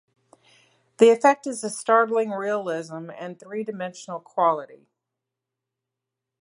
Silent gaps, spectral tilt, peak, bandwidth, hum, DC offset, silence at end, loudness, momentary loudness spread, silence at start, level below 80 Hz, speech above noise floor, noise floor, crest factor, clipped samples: none; -4.5 dB/octave; -2 dBFS; 11.5 kHz; none; under 0.1%; 1.7 s; -23 LUFS; 18 LU; 1 s; -82 dBFS; 63 dB; -85 dBFS; 22 dB; under 0.1%